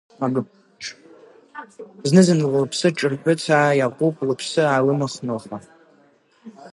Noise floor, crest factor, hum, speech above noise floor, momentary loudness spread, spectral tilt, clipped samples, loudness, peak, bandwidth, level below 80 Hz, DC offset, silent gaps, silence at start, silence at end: -57 dBFS; 20 dB; none; 37 dB; 22 LU; -5.5 dB/octave; under 0.1%; -20 LUFS; 0 dBFS; 11.5 kHz; -68 dBFS; under 0.1%; none; 0.2 s; 0.05 s